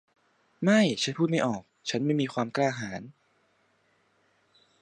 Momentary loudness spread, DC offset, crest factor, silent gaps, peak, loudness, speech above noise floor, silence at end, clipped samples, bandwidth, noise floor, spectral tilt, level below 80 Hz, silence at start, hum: 13 LU; under 0.1%; 20 dB; none; -10 dBFS; -27 LUFS; 42 dB; 1.7 s; under 0.1%; 11 kHz; -69 dBFS; -5 dB/octave; -72 dBFS; 0.6 s; none